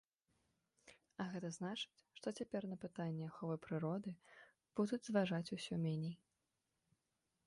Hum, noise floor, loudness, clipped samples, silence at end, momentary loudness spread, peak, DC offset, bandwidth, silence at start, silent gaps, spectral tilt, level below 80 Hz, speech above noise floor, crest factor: none; -88 dBFS; -44 LUFS; under 0.1%; 1.3 s; 13 LU; -24 dBFS; under 0.1%; 11.5 kHz; 0.85 s; none; -6 dB/octave; -82 dBFS; 45 dB; 22 dB